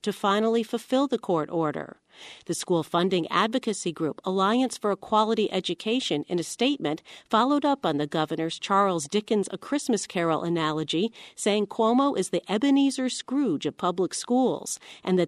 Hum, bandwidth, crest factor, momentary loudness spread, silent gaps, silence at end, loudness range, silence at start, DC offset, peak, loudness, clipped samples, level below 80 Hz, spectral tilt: none; 13.5 kHz; 18 dB; 7 LU; none; 0 s; 2 LU; 0.05 s; under 0.1%; -8 dBFS; -26 LUFS; under 0.1%; -72 dBFS; -4.5 dB/octave